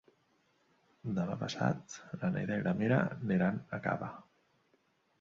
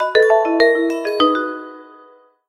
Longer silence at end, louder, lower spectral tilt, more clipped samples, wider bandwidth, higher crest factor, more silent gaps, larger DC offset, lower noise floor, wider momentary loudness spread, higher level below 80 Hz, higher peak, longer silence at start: first, 1 s vs 0.65 s; second, -35 LUFS vs -16 LUFS; first, -7 dB/octave vs -3 dB/octave; neither; second, 7.6 kHz vs 12.5 kHz; about the same, 20 dB vs 16 dB; neither; neither; first, -74 dBFS vs -48 dBFS; about the same, 13 LU vs 15 LU; second, -68 dBFS vs -58 dBFS; second, -16 dBFS vs 0 dBFS; first, 1.05 s vs 0 s